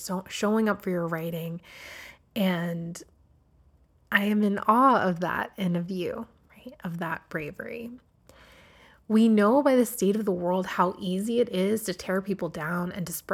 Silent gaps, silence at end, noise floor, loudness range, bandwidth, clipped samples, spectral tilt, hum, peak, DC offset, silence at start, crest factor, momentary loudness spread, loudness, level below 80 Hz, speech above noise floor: none; 0 s; -61 dBFS; 9 LU; 17.5 kHz; under 0.1%; -6 dB/octave; none; -6 dBFS; under 0.1%; 0 s; 20 dB; 18 LU; -26 LUFS; -62 dBFS; 35 dB